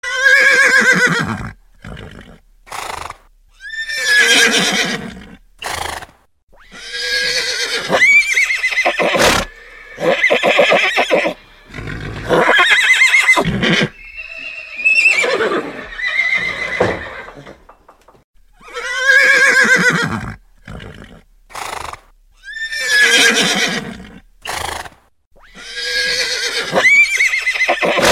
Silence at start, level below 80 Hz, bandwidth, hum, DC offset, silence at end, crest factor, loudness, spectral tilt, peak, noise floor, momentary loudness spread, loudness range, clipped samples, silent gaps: 0.05 s; -42 dBFS; 16.5 kHz; none; under 0.1%; 0 s; 16 dB; -12 LUFS; -2 dB/octave; 0 dBFS; -49 dBFS; 22 LU; 7 LU; under 0.1%; 6.43-6.47 s, 18.24-18.34 s, 25.26-25.31 s